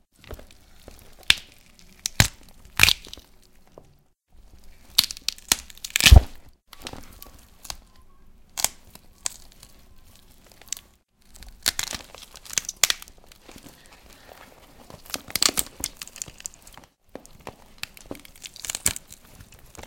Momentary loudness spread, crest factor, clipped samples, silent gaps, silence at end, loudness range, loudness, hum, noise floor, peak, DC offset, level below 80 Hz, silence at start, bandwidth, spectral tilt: 27 LU; 28 dB; under 0.1%; none; 0.05 s; 12 LU; -23 LUFS; none; -58 dBFS; 0 dBFS; under 0.1%; -34 dBFS; 0.3 s; 17 kHz; -2 dB/octave